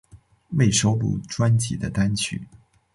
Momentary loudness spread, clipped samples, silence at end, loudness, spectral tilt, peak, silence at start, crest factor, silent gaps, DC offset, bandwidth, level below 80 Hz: 9 LU; under 0.1%; 0.5 s; -22 LUFS; -5 dB/octave; -6 dBFS; 0.15 s; 16 dB; none; under 0.1%; 11.5 kHz; -46 dBFS